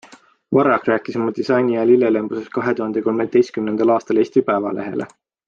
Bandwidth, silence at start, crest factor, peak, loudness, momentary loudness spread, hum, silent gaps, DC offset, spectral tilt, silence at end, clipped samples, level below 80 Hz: 7.2 kHz; 0.1 s; 16 dB; -2 dBFS; -18 LUFS; 9 LU; none; none; under 0.1%; -7.5 dB/octave; 0.4 s; under 0.1%; -64 dBFS